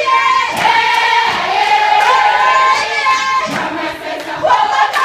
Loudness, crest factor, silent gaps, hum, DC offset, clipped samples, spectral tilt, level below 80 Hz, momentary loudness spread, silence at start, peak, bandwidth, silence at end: -12 LUFS; 12 dB; none; none; under 0.1%; under 0.1%; -1.5 dB/octave; -52 dBFS; 8 LU; 0 s; 0 dBFS; 15.5 kHz; 0 s